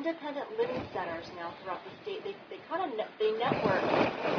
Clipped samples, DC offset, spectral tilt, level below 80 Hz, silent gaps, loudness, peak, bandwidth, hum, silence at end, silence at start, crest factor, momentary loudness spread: under 0.1%; under 0.1%; -6.5 dB/octave; -66 dBFS; none; -33 LUFS; -12 dBFS; 5.4 kHz; none; 0 s; 0 s; 22 dB; 12 LU